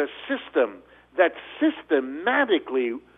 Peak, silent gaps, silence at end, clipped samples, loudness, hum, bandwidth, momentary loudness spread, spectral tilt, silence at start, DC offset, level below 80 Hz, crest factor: -6 dBFS; none; 0.2 s; under 0.1%; -24 LUFS; 60 Hz at -65 dBFS; 3.9 kHz; 6 LU; -6.5 dB/octave; 0 s; under 0.1%; -68 dBFS; 20 dB